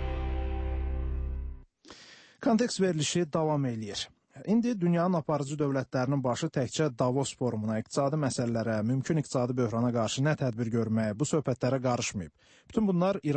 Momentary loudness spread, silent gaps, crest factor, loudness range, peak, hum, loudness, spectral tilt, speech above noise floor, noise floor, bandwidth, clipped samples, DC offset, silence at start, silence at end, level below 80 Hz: 8 LU; none; 16 dB; 2 LU; -14 dBFS; none; -30 LUFS; -6 dB/octave; 25 dB; -54 dBFS; 8.8 kHz; under 0.1%; under 0.1%; 0 s; 0 s; -42 dBFS